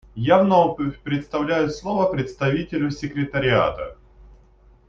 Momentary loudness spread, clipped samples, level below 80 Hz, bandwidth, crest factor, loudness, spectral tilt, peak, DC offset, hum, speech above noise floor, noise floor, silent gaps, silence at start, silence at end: 10 LU; under 0.1%; -46 dBFS; 7.4 kHz; 20 dB; -21 LUFS; -7 dB/octave; -2 dBFS; under 0.1%; none; 32 dB; -52 dBFS; none; 0.15 s; 0.55 s